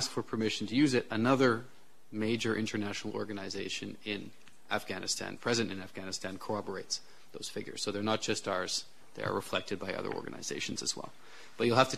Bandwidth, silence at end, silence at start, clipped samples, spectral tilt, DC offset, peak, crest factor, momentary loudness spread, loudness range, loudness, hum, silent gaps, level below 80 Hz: 14 kHz; 0 s; 0 s; under 0.1%; -4 dB/octave; 0.4%; -8 dBFS; 26 dB; 12 LU; 5 LU; -34 LUFS; none; none; -70 dBFS